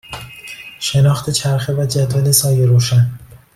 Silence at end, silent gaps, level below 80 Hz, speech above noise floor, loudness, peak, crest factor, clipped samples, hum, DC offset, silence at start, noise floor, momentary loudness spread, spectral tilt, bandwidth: 0.3 s; none; -46 dBFS; 21 dB; -15 LUFS; 0 dBFS; 16 dB; under 0.1%; none; under 0.1%; 0.1 s; -34 dBFS; 18 LU; -5 dB/octave; 15.5 kHz